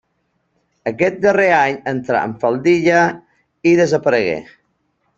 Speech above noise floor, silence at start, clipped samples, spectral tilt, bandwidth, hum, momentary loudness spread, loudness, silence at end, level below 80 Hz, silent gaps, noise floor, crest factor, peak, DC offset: 52 dB; 0.85 s; under 0.1%; -6 dB/octave; 7.6 kHz; none; 11 LU; -16 LUFS; 0.75 s; -58 dBFS; none; -67 dBFS; 16 dB; 0 dBFS; under 0.1%